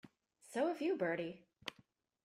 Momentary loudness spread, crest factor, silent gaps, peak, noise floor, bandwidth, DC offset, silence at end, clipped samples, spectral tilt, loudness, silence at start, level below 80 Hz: 13 LU; 18 dB; none; -24 dBFS; -72 dBFS; 14 kHz; under 0.1%; 0.55 s; under 0.1%; -5.5 dB/octave; -41 LUFS; 0.05 s; -82 dBFS